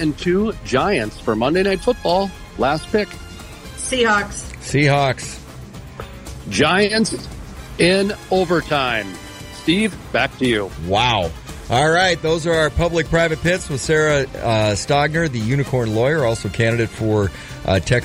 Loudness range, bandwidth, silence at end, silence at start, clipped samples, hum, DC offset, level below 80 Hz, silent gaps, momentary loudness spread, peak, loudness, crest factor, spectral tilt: 3 LU; 16 kHz; 0 s; 0 s; under 0.1%; none; under 0.1%; -38 dBFS; none; 18 LU; -4 dBFS; -18 LUFS; 14 dB; -5 dB/octave